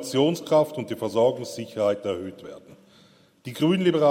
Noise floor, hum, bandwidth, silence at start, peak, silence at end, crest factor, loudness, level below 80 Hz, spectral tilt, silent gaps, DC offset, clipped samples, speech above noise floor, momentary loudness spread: -56 dBFS; none; 16 kHz; 0 s; -8 dBFS; 0 s; 16 dB; -24 LUFS; -70 dBFS; -6 dB/octave; none; under 0.1%; under 0.1%; 33 dB; 18 LU